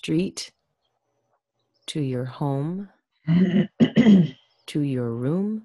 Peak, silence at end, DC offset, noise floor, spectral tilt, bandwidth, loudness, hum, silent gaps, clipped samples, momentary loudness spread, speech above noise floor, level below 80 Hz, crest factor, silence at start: -6 dBFS; 0.05 s; under 0.1%; -75 dBFS; -7 dB/octave; 11.5 kHz; -22 LUFS; none; none; under 0.1%; 19 LU; 53 dB; -60 dBFS; 18 dB; 0.05 s